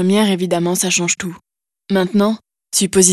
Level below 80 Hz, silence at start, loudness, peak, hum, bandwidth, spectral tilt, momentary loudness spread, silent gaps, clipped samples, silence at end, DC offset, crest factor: -54 dBFS; 0 s; -16 LUFS; 0 dBFS; none; 13 kHz; -3.5 dB/octave; 6 LU; none; under 0.1%; 0 s; under 0.1%; 16 dB